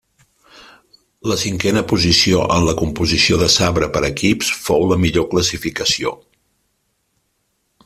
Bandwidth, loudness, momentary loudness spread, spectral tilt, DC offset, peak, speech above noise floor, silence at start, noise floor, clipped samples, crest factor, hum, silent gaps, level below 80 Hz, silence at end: 15 kHz; -16 LUFS; 7 LU; -4 dB/octave; under 0.1%; 0 dBFS; 51 dB; 0.55 s; -67 dBFS; under 0.1%; 18 dB; none; none; -38 dBFS; 1.7 s